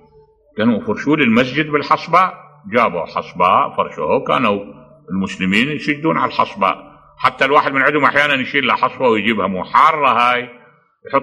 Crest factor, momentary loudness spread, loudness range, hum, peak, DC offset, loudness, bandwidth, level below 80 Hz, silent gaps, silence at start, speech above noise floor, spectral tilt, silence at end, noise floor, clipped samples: 16 dB; 8 LU; 4 LU; none; 0 dBFS; under 0.1%; -15 LUFS; 13 kHz; -54 dBFS; none; 0.55 s; 35 dB; -6 dB/octave; 0 s; -50 dBFS; under 0.1%